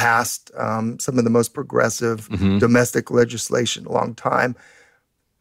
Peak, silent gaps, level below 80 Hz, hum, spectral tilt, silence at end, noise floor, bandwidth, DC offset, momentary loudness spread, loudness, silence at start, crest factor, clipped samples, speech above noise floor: -4 dBFS; none; -52 dBFS; none; -4.5 dB/octave; 0.85 s; -65 dBFS; 16 kHz; under 0.1%; 7 LU; -20 LUFS; 0 s; 16 dB; under 0.1%; 46 dB